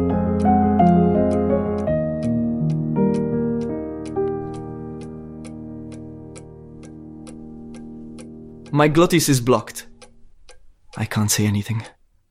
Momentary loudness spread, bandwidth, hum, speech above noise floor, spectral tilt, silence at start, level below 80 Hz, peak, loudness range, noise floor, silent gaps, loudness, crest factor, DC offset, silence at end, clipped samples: 23 LU; 16 kHz; none; 27 dB; -6 dB/octave; 0 s; -42 dBFS; -2 dBFS; 17 LU; -45 dBFS; none; -20 LUFS; 18 dB; under 0.1%; 0.4 s; under 0.1%